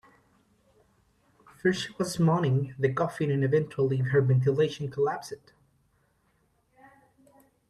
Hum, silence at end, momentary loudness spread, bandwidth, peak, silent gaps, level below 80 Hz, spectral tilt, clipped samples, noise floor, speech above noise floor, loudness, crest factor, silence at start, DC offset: none; 2.35 s; 7 LU; 13 kHz; -12 dBFS; none; -66 dBFS; -7 dB/octave; under 0.1%; -70 dBFS; 43 dB; -27 LUFS; 18 dB; 1.65 s; under 0.1%